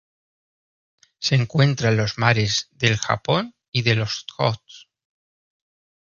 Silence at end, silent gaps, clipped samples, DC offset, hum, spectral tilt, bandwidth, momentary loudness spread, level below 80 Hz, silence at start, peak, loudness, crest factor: 1.25 s; 3.68-3.72 s; under 0.1%; under 0.1%; none; -5 dB/octave; 7.2 kHz; 7 LU; -52 dBFS; 1.2 s; 0 dBFS; -21 LUFS; 22 dB